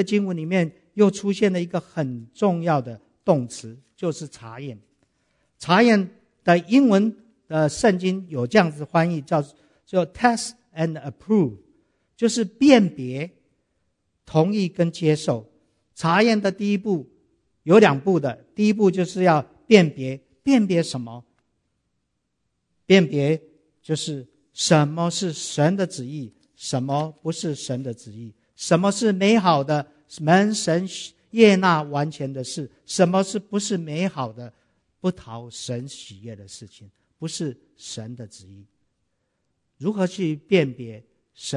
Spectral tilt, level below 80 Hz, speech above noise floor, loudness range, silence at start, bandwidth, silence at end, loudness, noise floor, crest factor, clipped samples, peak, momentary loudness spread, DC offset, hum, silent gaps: -5.5 dB/octave; -64 dBFS; 54 dB; 10 LU; 0 s; 11 kHz; 0 s; -21 LUFS; -75 dBFS; 22 dB; under 0.1%; 0 dBFS; 19 LU; under 0.1%; none; none